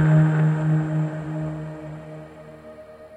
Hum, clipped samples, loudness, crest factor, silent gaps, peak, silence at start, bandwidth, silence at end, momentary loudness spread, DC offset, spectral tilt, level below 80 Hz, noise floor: none; under 0.1%; -22 LUFS; 16 dB; none; -8 dBFS; 0 s; 7.8 kHz; 0 s; 24 LU; under 0.1%; -9.5 dB/octave; -54 dBFS; -42 dBFS